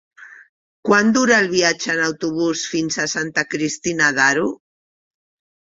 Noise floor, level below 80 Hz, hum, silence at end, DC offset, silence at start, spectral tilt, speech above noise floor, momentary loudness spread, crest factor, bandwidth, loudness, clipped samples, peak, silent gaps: under -90 dBFS; -60 dBFS; none; 1.15 s; under 0.1%; 0.2 s; -3 dB/octave; over 72 dB; 8 LU; 18 dB; 8 kHz; -18 LUFS; under 0.1%; -2 dBFS; 0.49-0.83 s